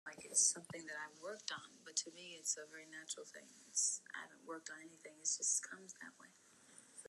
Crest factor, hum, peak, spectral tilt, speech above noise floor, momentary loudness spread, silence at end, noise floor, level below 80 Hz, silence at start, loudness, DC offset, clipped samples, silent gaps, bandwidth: 24 dB; none; -20 dBFS; 0.5 dB/octave; 20 dB; 20 LU; 0 s; -65 dBFS; under -90 dBFS; 0.05 s; -40 LUFS; under 0.1%; under 0.1%; none; 12.5 kHz